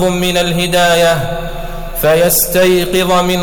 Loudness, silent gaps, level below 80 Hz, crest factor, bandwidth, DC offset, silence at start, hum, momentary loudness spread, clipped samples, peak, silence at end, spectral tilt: -11 LUFS; none; -28 dBFS; 10 dB; over 20 kHz; under 0.1%; 0 s; none; 13 LU; under 0.1%; -2 dBFS; 0 s; -4 dB/octave